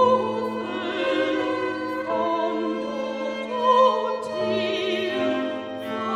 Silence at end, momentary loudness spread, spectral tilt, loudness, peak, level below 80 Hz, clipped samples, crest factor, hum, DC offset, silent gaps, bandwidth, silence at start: 0 s; 9 LU; -5 dB/octave; -24 LUFS; -6 dBFS; -66 dBFS; under 0.1%; 16 dB; none; under 0.1%; none; 11.5 kHz; 0 s